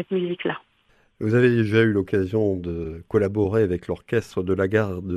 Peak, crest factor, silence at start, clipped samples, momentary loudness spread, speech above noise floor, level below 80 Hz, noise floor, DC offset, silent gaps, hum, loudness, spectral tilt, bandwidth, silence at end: -6 dBFS; 16 dB; 0 s; under 0.1%; 10 LU; 40 dB; -50 dBFS; -62 dBFS; under 0.1%; none; none; -23 LUFS; -8 dB/octave; 12 kHz; 0 s